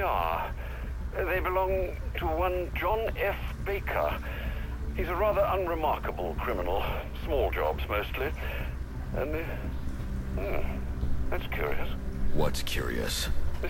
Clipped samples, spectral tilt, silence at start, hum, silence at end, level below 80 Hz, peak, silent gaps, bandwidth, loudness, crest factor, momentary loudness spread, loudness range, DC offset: under 0.1%; -5.5 dB/octave; 0 s; none; 0 s; -34 dBFS; -12 dBFS; none; 16.5 kHz; -32 LUFS; 16 dB; 8 LU; 4 LU; under 0.1%